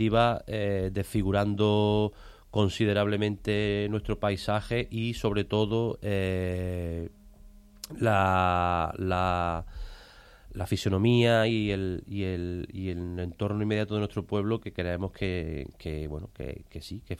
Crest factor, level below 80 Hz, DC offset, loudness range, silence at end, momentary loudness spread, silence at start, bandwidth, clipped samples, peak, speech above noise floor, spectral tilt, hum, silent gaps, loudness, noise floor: 18 dB; -46 dBFS; under 0.1%; 4 LU; 0 s; 14 LU; 0 s; 14 kHz; under 0.1%; -10 dBFS; 24 dB; -7 dB/octave; none; none; -29 LUFS; -52 dBFS